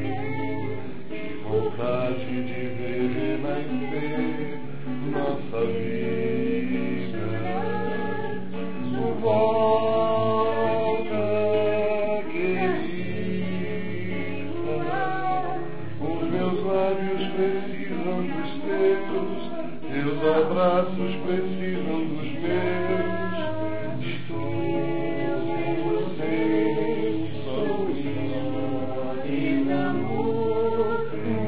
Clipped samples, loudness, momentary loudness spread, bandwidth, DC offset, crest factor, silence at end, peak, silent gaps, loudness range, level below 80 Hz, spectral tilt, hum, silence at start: under 0.1%; -26 LUFS; 8 LU; 4 kHz; 4%; 18 dB; 0 s; -8 dBFS; none; 4 LU; -56 dBFS; -11 dB/octave; none; 0 s